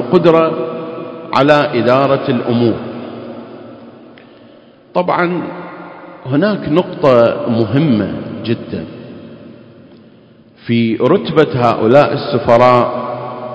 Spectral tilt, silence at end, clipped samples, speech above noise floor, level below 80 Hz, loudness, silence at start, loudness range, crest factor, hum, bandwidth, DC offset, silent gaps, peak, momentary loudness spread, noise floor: -8 dB/octave; 0 s; 0.4%; 32 dB; -48 dBFS; -13 LUFS; 0 s; 8 LU; 14 dB; none; 8 kHz; under 0.1%; none; 0 dBFS; 21 LU; -44 dBFS